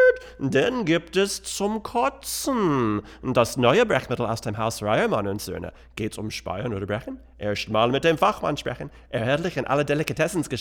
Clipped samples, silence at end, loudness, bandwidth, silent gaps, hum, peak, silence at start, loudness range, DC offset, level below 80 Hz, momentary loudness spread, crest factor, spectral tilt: under 0.1%; 0 s; -24 LUFS; 20 kHz; none; none; -4 dBFS; 0 s; 4 LU; under 0.1%; -50 dBFS; 11 LU; 20 dB; -5 dB/octave